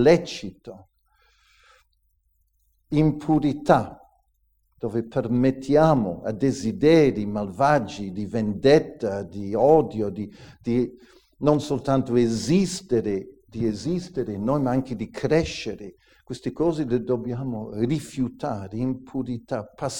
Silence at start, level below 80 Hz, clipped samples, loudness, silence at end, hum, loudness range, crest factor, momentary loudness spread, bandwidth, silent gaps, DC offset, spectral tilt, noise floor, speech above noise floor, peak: 0 s; -48 dBFS; under 0.1%; -24 LUFS; 0 s; none; 6 LU; 22 dB; 14 LU; 17 kHz; none; under 0.1%; -6.5 dB/octave; -68 dBFS; 45 dB; -2 dBFS